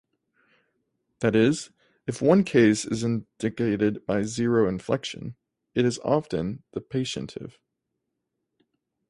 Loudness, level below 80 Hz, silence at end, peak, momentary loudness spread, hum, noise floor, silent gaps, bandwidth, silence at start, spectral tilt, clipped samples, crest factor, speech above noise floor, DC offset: -25 LUFS; -58 dBFS; 1.6 s; -6 dBFS; 16 LU; none; -81 dBFS; none; 11.5 kHz; 1.2 s; -6 dB/octave; under 0.1%; 20 dB; 57 dB; under 0.1%